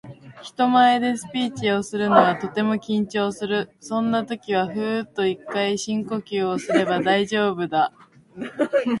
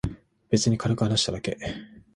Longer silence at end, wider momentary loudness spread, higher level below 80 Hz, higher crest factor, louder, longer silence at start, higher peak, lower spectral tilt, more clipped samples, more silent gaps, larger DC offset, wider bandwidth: second, 0 s vs 0.15 s; about the same, 10 LU vs 12 LU; second, -64 dBFS vs -46 dBFS; about the same, 22 dB vs 18 dB; first, -22 LUFS vs -26 LUFS; about the same, 0.05 s vs 0.05 s; first, 0 dBFS vs -8 dBFS; about the same, -5 dB/octave vs -5 dB/octave; neither; neither; neither; about the same, 11.5 kHz vs 11.5 kHz